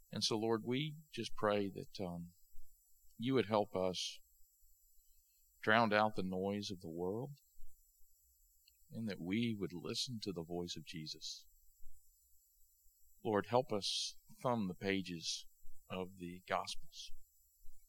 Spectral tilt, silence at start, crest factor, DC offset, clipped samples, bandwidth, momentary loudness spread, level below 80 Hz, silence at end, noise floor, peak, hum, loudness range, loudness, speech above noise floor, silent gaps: -4.5 dB/octave; 0.1 s; 26 dB; under 0.1%; under 0.1%; 18 kHz; 13 LU; -64 dBFS; 0.05 s; -72 dBFS; -14 dBFS; none; 6 LU; -40 LUFS; 32 dB; none